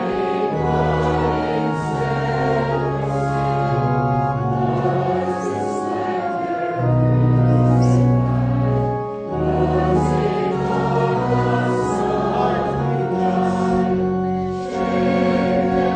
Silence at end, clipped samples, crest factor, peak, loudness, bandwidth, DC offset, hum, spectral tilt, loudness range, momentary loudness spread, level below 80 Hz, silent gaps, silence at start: 0 s; under 0.1%; 14 dB; -4 dBFS; -19 LUFS; 9.2 kHz; under 0.1%; none; -8 dB/octave; 3 LU; 6 LU; -38 dBFS; none; 0 s